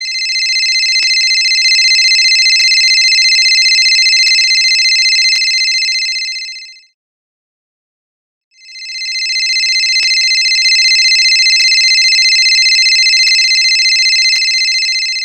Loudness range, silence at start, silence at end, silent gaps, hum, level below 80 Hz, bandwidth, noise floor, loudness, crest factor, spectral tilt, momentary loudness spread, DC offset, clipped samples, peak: 10 LU; 0 s; 0 s; 6.94-8.51 s; none; -76 dBFS; 15.5 kHz; under -90 dBFS; -7 LUFS; 10 dB; 8 dB/octave; 7 LU; under 0.1%; under 0.1%; 0 dBFS